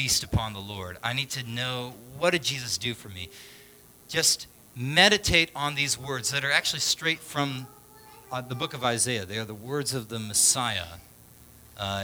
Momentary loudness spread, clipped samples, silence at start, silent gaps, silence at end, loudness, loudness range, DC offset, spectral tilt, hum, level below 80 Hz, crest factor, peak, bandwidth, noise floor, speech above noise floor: 16 LU; under 0.1%; 0 s; none; 0 s; -26 LUFS; 6 LU; under 0.1%; -2 dB/octave; none; -50 dBFS; 26 dB; -2 dBFS; over 20 kHz; -53 dBFS; 25 dB